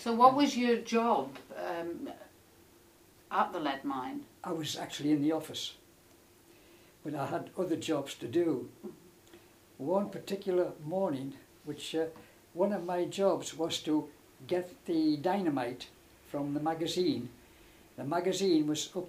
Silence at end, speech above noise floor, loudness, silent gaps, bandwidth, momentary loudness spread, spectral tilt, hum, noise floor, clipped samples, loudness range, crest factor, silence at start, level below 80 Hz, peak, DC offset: 0 s; 29 dB; -33 LUFS; none; 15.5 kHz; 15 LU; -5 dB/octave; none; -61 dBFS; under 0.1%; 4 LU; 26 dB; 0 s; -72 dBFS; -8 dBFS; under 0.1%